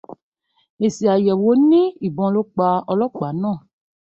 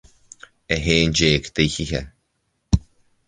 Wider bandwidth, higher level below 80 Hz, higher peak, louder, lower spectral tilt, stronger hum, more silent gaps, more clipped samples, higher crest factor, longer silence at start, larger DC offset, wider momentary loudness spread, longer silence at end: second, 8 kHz vs 9.8 kHz; second, -62 dBFS vs -34 dBFS; second, -6 dBFS vs -2 dBFS; about the same, -18 LUFS vs -20 LUFS; first, -8 dB/octave vs -4.5 dB/octave; neither; first, 0.22-0.32 s, 0.70-0.77 s vs none; neither; second, 14 dB vs 22 dB; second, 0.1 s vs 0.7 s; neither; about the same, 9 LU vs 9 LU; about the same, 0.55 s vs 0.45 s